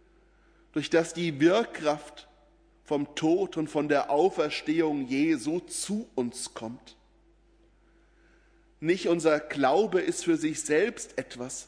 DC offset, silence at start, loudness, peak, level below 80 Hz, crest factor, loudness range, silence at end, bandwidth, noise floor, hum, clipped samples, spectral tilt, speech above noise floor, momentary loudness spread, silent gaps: under 0.1%; 0.75 s; -28 LUFS; -10 dBFS; -64 dBFS; 18 dB; 7 LU; 0.05 s; 11 kHz; -62 dBFS; none; under 0.1%; -4.5 dB/octave; 34 dB; 12 LU; none